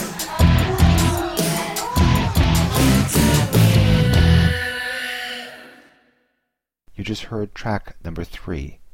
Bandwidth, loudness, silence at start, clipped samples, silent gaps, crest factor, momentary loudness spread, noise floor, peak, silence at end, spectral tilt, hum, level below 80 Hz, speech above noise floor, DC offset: 17 kHz; -18 LUFS; 0 s; under 0.1%; none; 16 dB; 15 LU; -77 dBFS; -2 dBFS; 0.2 s; -5 dB/octave; none; -26 dBFS; 50 dB; under 0.1%